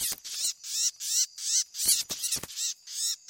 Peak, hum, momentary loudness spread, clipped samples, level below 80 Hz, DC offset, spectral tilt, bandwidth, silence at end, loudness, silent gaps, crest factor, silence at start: -8 dBFS; none; 7 LU; under 0.1%; -68 dBFS; under 0.1%; 2.5 dB/octave; 16.5 kHz; 0.1 s; -27 LUFS; none; 22 dB; 0 s